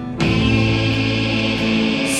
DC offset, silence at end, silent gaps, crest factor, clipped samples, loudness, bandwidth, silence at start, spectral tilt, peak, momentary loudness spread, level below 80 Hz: under 0.1%; 0 s; none; 14 dB; under 0.1%; -17 LUFS; 14 kHz; 0 s; -5 dB/octave; -4 dBFS; 2 LU; -32 dBFS